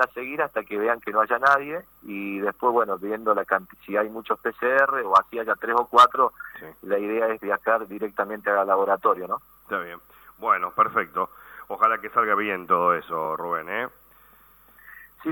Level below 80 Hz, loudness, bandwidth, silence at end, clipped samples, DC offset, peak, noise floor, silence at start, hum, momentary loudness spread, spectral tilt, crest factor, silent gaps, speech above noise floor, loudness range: -66 dBFS; -23 LUFS; 19.5 kHz; 0 s; under 0.1%; under 0.1%; -6 dBFS; -54 dBFS; 0 s; none; 12 LU; -5 dB/octave; 18 dB; none; 31 dB; 4 LU